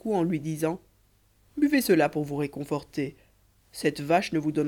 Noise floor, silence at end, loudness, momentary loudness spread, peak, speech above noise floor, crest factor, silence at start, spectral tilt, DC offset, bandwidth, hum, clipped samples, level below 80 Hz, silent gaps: -64 dBFS; 0 s; -27 LUFS; 12 LU; -10 dBFS; 37 dB; 16 dB; 0.05 s; -6 dB/octave; under 0.1%; 19 kHz; none; under 0.1%; -60 dBFS; none